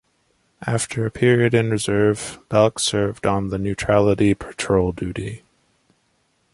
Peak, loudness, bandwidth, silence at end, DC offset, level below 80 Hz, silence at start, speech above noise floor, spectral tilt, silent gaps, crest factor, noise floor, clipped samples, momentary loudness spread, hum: -2 dBFS; -20 LUFS; 11.5 kHz; 1.15 s; under 0.1%; -44 dBFS; 0.6 s; 46 dB; -5.5 dB/octave; none; 18 dB; -66 dBFS; under 0.1%; 11 LU; none